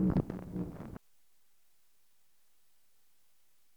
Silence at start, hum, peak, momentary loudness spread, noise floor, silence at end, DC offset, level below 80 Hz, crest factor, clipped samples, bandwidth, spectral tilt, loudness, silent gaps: 0 s; none; -16 dBFS; 17 LU; -75 dBFS; 2.8 s; under 0.1%; -54 dBFS; 24 dB; under 0.1%; over 20 kHz; -9.5 dB/octave; -38 LUFS; none